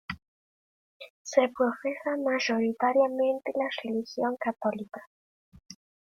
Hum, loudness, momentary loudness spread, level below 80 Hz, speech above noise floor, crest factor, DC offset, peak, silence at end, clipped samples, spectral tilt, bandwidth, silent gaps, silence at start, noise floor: none; -28 LUFS; 18 LU; -70 dBFS; over 62 dB; 20 dB; under 0.1%; -10 dBFS; 0.3 s; under 0.1%; -4.5 dB/octave; 7.4 kHz; 0.28-1.00 s, 1.10-1.25 s, 5.07-5.52 s; 0.1 s; under -90 dBFS